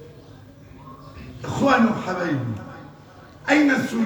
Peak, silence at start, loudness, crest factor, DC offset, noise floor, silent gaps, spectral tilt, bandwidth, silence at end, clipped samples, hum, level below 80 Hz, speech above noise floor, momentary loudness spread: -4 dBFS; 0 s; -21 LUFS; 20 dB; under 0.1%; -45 dBFS; none; -6 dB/octave; over 20 kHz; 0 s; under 0.1%; none; -52 dBFS; 25 dB; 24 LU